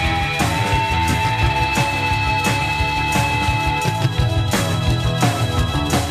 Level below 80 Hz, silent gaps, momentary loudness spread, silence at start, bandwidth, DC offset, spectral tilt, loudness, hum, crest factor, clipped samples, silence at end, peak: -28 dBFS; none; 2 LU; 0 s; 15.5 kHz; 0.2%; -4.5 dB/octave; -18 LUFS; none; 14 dB; under 0.1%; 0 s; -4 dBFS